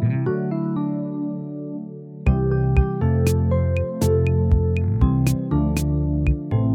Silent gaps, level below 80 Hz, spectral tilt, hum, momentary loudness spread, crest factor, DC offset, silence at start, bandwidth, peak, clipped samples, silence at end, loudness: none; -28 dBFS; -8 dB/octave; none; 9 LU; 14 dB; under 0.1%; 0 s; 16 kHz; -6 dBFS; under 0.1%; 0 s; -21 LUFS